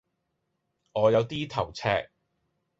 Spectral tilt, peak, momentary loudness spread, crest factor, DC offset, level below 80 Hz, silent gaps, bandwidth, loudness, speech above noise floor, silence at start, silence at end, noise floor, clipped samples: -6 dB/octave; -8 dBFS; 8 LU; 20 dB; under 0.1%; -58 dBFS; none; 7.8 kHz; -27 LUFS; 53 dB; 0.95 s; 0.75 s; -79 dBFS; under 0.1%